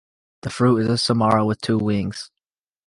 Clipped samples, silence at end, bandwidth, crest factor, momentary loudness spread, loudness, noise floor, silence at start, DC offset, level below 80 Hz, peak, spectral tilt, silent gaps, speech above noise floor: under 0.1%; 0.6 s; 11.5 kHz; 18 dB; 16 LU; -20 LUFS; -87 dBFS; 0.45 s; under 0.1%; -50 dBFS; -4 dBFS; -6 dB/octave; none; 67 dB